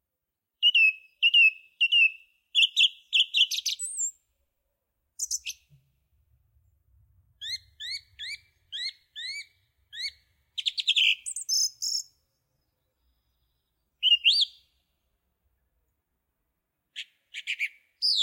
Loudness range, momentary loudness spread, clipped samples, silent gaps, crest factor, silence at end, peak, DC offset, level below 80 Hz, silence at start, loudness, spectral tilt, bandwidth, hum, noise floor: 17 LU; 20 LU; under 0.1%; none; 20 dB; 0 s; -10 dBFS; under 0.1%; -74 dBFS; 0.6 s; -23 LUFS; 6.5 dB/octave; 16.5 kHz; none; -86 dBFS